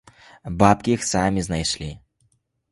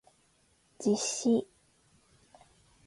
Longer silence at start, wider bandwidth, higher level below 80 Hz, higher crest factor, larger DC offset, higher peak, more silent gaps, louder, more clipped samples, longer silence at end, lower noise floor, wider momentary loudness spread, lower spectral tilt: second, 0.45 s vs 0.8 s; about the same, 11.5 kHz vs 11.5 kHz; first, -42 dBFS vs -74 dBFS; about the same, 22 dB vs 18 dB; neither; first, 0 dBFS vs -16 dBFS; neither; first, -21 LUFS vs -30 LUFS; neither; second, 0.75 s vs 1.45 s; about the same, -67 dBFS vs -69 dBFS; first, 17 LU vs 8 LU; about the same, -4.5 dB/octave vs -4 dB/octave